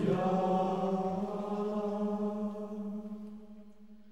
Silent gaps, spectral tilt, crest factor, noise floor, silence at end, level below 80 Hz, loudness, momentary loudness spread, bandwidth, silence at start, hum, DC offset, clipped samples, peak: none; -8.5 dB/octave; 16 dB; -56 dBFS; 0 s; -66 dBFS; -34 LUFS; 17 LU; 8.6 kHz; 0 s; none; 0.2%; under 0.1%; -18 dBFS